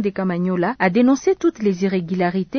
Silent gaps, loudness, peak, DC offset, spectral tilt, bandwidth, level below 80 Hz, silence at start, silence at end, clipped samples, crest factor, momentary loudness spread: none; -19 LUFS; -2 dBFS; under 0.1%; -7 dB/octave; 6.6 kHz; -56 dBFS; 0 s; 0 s; under 0.1%; 16 dB; 5 LU